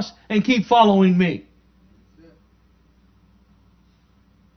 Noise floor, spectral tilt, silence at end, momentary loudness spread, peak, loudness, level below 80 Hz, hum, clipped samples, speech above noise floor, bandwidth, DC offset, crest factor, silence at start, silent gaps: -57 dBFS; -7 dB/octave; 3.15 s; 9 LU; 0 dBFS; -17 LUFS; -56 dBFS; none; under 0.1%; 40 dB; 6.6 kHz; under 0.1%; 22 dB; 0 s; none